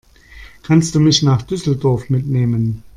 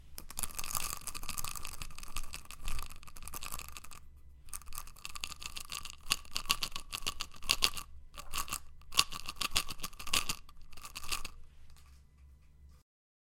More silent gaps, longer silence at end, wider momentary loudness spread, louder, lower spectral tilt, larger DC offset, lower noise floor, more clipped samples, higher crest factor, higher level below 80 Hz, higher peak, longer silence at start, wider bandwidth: neither; second, 0.15 s vs 0.55 s; second, 7 LU vs 16 LU; first, -16 LUFS vs -37 LUFS; first, -6 dB/octave vs 0 dB/octave; neither; second, -40 dBFS vs -59 dBFS; neither; second, 16 dB vs 36 dB; about the same, -42 dBFS vs -46 dBFS; about the same, 0 dBFS vs -2 dBFS; first, 0.35 s vs 0 s; second, 11.5 kHz vs 17 kHz